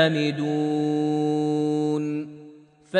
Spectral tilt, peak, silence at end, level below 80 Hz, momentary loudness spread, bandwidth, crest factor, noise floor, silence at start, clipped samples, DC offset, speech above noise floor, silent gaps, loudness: -6.5 dB/octave; -6 dBFS; 0 s; -72 dBFS; 6 LU; 9.4 kHz; 18 dB; -49 dBFS; 0 s; under 0.1%; under 0.1%; 25 dB; none; -24 LUFS